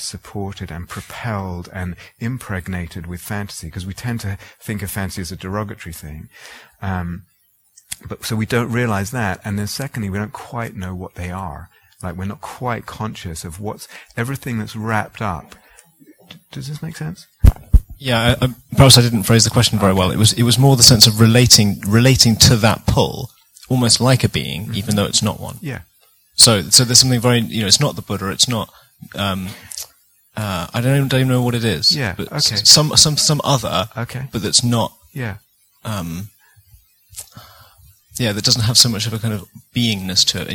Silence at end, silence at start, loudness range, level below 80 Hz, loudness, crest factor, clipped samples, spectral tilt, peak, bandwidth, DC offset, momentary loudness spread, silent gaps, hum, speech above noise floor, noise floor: 0 s; 0 s; 16 LU; -32 dBFS; -15 LUFS; 18 dB; 0.1%; -3.5 dB/octave; 0 dBFS; over 20 kHz; under 0.1%; 21 LU; none; none; 37 dB; -54 dBFS